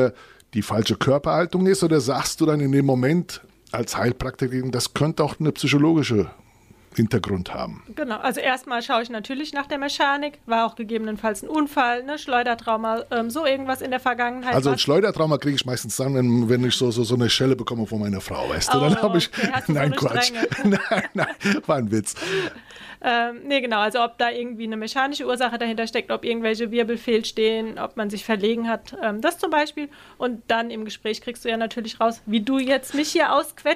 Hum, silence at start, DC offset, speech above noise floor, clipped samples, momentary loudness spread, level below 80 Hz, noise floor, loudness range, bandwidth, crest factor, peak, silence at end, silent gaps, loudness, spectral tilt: none; 0 s; under 0.1%; 29 dB; under 0.1%; 9 LU; -52 dBFS; -52 dBFS; 4 LU; 15.5 kHz; 14 dB; -8 dBFS; 0 s; none; -22 LUFS; -5 dB/octave